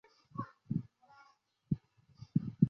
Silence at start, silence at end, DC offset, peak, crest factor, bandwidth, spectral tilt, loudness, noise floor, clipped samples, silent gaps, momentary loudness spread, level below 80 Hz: 0.35 s; 0 s; under 0.1%; -14 dBFS; 26 dB; 6 kHz; -11 dB/octave; -41 LUFS; -69 dBFS; under 0.1%; none; 21 LU; -66 dBFS